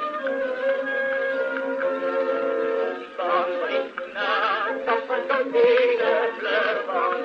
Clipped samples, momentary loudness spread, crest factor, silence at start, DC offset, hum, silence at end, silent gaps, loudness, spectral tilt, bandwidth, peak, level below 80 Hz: under 0.1%; 7 LU; 16 dB; 0 s; under 0.1%; none; 0 s; none; -23 LUFS; -4 dB/octave; 6.6 kHz; -8 dBFS; -74 dBFS